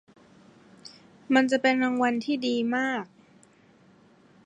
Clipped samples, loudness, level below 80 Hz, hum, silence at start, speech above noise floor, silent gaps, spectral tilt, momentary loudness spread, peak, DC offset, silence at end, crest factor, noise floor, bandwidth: under 0.1%; -25 LUFS; -80 dBFS; none; 0.85 s; 34 dB; none; -4 dB/octave; 24 LU; -8 dBFS; under 0.1%; 1.4 s; 20 dB; -58 dBFS; 9.8 kHz